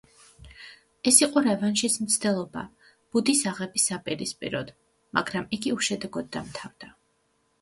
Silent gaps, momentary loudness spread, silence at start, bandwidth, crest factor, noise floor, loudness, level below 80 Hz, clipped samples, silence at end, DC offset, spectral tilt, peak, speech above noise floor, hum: none; 20 LU; 0.4 s; 12 kHz; 24 dB; -70 dBFS; -25 LUFS; -62 dBFS; under 0.1%; 0.75 s; under 0.1%; -2.5 dB/octave; -4 dBFS; 44 dB; none